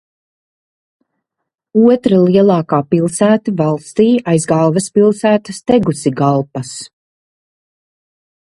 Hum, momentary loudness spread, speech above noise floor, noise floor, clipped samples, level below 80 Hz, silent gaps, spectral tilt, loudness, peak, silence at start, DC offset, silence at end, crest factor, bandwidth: none; 7 LU; 65 dB; -78 dBFS; under 0.1%; -54 dBFS; none; -6.5 dB/octave; -13 LUFS; 0 dBFS; 1.75 s; under 0.1%; 1.65 s; 14 dB; 11.5 kHz